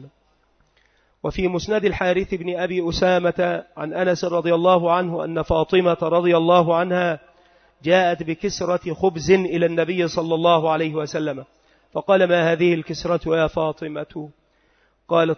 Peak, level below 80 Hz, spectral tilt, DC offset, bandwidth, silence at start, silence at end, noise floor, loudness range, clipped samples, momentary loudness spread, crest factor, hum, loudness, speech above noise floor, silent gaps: -2 dBFS; -46 dBFS; -6 dB/octave; under 0.1%; 6.6 kHz; 0 s; 0.05 s; -62 dBFS; 3 LU; under 0.1%; 12 LU; 18 dB; none; -20 LUFS; 43 dB; none